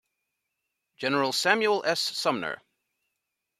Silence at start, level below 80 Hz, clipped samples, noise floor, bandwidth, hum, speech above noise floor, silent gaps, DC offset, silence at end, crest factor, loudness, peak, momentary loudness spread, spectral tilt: 1 s; -78 dBFS; under 0.1%; -83 dBFS; 15.5 kHz; none; 57 dB; none; under 0.1%; 1.05 s; 24 dB; -26 LUFS; -6 dBFS; 11 LU; -2.5 dB/octave